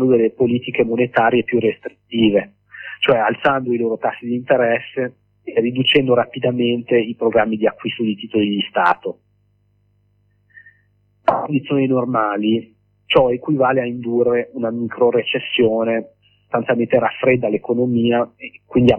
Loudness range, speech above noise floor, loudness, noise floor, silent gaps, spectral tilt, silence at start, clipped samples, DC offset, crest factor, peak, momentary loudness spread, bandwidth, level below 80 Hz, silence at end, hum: 5 LU; 44 dB; -18 LUFS; -61 dBFS; none; -8 dB/octave; 0 s; under 0.1%; under 0.1%; 16 dB; -2 dBFS; 8 LU; 5.2 kHz; -54 dBFS; 0 s; 50 Hz at -50 dBFS